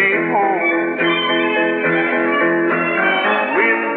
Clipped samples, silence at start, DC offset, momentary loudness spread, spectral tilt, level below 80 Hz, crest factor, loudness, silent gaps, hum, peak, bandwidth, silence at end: under 0.1%; 0 s; under 0.1%; 2 LU; -8 dB/octave; -78 dBFS; 12 dB; -16 LUFS; none; none; -4 dBFS; 4.4 kHz; 0 s